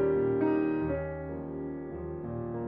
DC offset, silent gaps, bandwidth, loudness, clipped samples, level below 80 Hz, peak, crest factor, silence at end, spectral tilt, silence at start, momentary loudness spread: under 0.1%; none; 4.1 kHz; -32 LUFS; under 0.1%; -50 dBFS; -16 dBFS; 14 dB; 0 s; -9 dB/octave; 0 s; 11 LU